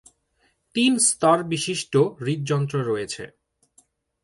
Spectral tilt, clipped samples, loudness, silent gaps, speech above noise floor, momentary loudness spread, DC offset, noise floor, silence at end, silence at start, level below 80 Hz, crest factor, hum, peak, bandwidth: -4 dB/octave; under 0.1%; -22 LUFS; none; 45 dB; 13 LU; under 0.1%; -67 dBFS; 0.95 s; 0.75 s; -64 dBFS; 18 dB; none; -6 dBFS; 11.5 kHz